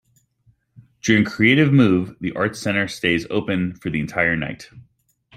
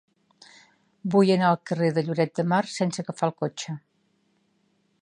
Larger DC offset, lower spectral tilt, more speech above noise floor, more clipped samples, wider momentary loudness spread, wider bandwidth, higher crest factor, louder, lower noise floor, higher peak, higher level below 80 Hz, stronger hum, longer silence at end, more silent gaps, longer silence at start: neither; about the same, -6 dB/octave vs -6 dB/octave; about the same, 42 dB vs 45 dB; neither; second, 11 LU vs 15 LU; first, 14.5 kHz vs 10.5 kHz; about the same, 20 dB vs 20 dB; first, -19 LUFS vs -25 LUFS; second, -61 dBFS vs -69 dBFS; first, -2 dBFS vs -6 dBFS; first, -52 dBFS vs -74 dBFS; neither; second, 0.55 s vs 1.25 s; neither; about the same, 1.05 s vs 1.05 s